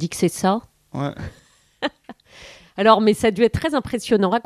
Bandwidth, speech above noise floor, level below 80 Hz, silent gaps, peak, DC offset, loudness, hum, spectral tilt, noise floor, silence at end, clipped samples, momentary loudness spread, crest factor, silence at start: 14 kHz; 26 dB; -46 dBFS; none; 0 dBFS; under 0.1%; -20 LUFS; none; -5.5 dB/octave; -45 dBFS; 0.05 s; under 0.1%; 18 LU; 20 dB; 0 s